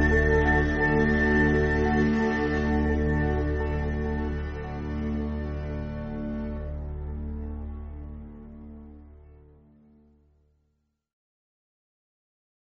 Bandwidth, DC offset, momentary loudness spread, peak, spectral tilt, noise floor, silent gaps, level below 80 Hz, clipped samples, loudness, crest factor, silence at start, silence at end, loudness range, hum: 6.6 kHz; under 0.1%; 19 LU; -10 dBFS; -6.5 dB/octave; -75 dBFS; none; -34 dBFS; under 0.1%; -26 LUFS; 18 dB; 0 s; 3.45 s; 18 LU; none